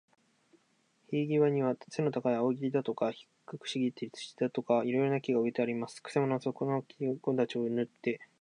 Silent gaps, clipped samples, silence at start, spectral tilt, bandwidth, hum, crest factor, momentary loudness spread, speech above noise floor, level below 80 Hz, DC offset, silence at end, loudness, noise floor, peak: none; under 0.1%; 1.1 s; -7 dB/octave; 10.5 kHz; none; 18 dB; 8 LU; 40 dB; -84 dBFS; under 0.1%; 0.15 s; -33 LUFS; -72 dBFS; -16 dBFS